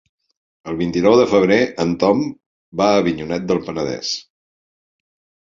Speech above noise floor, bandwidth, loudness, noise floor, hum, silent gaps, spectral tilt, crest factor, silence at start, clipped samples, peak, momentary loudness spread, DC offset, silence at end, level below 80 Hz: over 73 dB; 7.6 kHz; -18 LUFS; under -90 dBFS; none; 2.46-2.72 s; -5.5 dB/octave; 18 dB; 0.65 s; under 0.1%; -2 dBFS; 14 LU; under 0.1%; 1.3 s; -50 dBFS